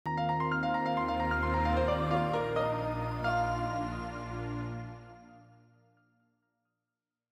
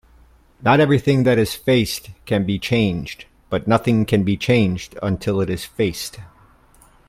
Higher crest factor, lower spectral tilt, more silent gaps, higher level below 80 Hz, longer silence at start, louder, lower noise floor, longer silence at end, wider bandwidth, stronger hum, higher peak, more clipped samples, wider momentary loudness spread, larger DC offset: about the same, 16 dB vs 18 dB; first, -7.5 dB/octave vs -6 dB/octave; neither; about the same, -46 dBFS vs -46 dBFS; second, 0.05 s vs 0.6 s; second, -32 LUFS vs -19 LUFS; first, under -90 dBFS vs -51 dBFS; first, 1.9 s vs 0.8 s; about the same, 15 kHz vs 16 kHz; first, 60 Hz at -65 dBFS vs none; second, -18 dBFS vs -2 dBFS; neither; about the same, 10 LU vs 11 LU; neither